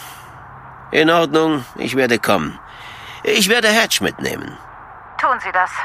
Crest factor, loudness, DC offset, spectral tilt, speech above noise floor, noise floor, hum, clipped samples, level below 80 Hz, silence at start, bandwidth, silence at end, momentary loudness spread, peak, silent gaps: 18 dB; -16 LUFS; under 0.1%; -3 dB/octave; 21 dB; -38 dBFS; none; under 0.1%; -50 dBFS; 0 s; 15.5 kHz; 0 s; 24 LU; 0 dBFS; none